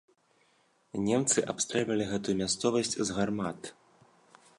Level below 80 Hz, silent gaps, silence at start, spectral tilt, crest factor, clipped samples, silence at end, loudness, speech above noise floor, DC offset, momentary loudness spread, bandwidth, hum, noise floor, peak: -62 dBFS; none; 0.95 s; -3.5 dB/octave; 20 dB; under 0.1%; 0.85 s; -30 LUFS; 39 dB; under 0.1%; 10 LU; 11.5 kHz; none; -69 dBFS; -12 dBFS